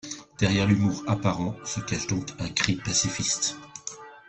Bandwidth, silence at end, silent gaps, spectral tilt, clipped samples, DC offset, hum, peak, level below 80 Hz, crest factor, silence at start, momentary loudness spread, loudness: 8.6 kHz; 0.1 s; none; -4 dB/octave; under 0.1%; under 0.1%; none; -2 dBFS; -52 dBFS; 24 dB; 0.05 s; 15 LU; -26 LUFS